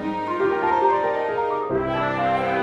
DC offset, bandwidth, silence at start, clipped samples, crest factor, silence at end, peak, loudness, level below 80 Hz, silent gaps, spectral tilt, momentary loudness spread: under 0.1%; 8 kHz; 0 s; under 0.1%; 14 dB; 0 s; -8 dBFS; -22 LUFS; -50 dBFS; none; -7 dB/octave; 4 LU